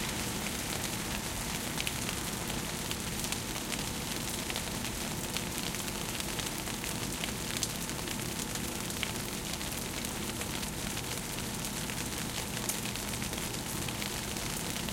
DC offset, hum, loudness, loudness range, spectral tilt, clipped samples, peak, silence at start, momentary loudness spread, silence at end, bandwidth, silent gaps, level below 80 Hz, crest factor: under 0.1%; none; -35 LUFS; 1 LU; -2.5 dB/octave; under 0.1%; -12 dBFS; 0 s; 2 LU; 0 s; 17 kHz; none; -48 dBFS; 24 dB